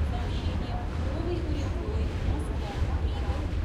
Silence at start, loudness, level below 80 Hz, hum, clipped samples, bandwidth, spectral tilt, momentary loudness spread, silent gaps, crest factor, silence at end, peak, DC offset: 0 s; -31 LUFS; -32 dBFS; none; under 0.1%; 11 kHz; -7 dB/octave; 2 LU; none; 12 dB; 0 s; -16 dBFS; under 0.1%